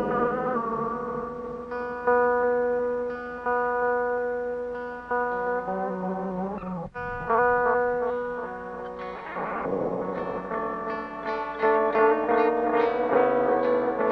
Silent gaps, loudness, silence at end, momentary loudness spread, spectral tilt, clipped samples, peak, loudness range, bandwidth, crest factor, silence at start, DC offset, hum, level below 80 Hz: none; -26 LUFS; 0 s; 12 LU; -8 dB/octave; under 0.1%; -8 dBFS; 6 LU; 5.8 kHz; 18 dB; 0 s; under 0.1%; none; -54 dBFS